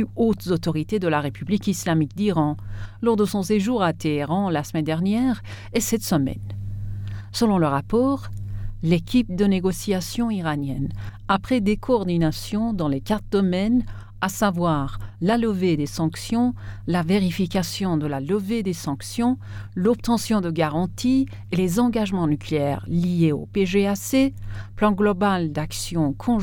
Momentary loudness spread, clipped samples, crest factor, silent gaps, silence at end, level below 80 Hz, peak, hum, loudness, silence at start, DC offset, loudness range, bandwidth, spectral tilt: 8 LU; under 0.1%; 16 dB; none; 0 s; -40 dBFS; -6 dBFS; none; -23 LUFS; 0 s; under 0.1%; 2 LU; 19 kHz; -6 dB/octave